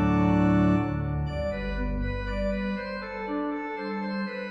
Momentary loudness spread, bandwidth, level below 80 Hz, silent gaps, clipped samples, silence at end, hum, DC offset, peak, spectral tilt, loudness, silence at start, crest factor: 10 LU; 7.4 kHz; -36 dBFS; none; under 0.1%; 0 s; none; under 0.1%; -12 dBFS; -9 dB/octave; -28 LUFS; 0 s; 14 dB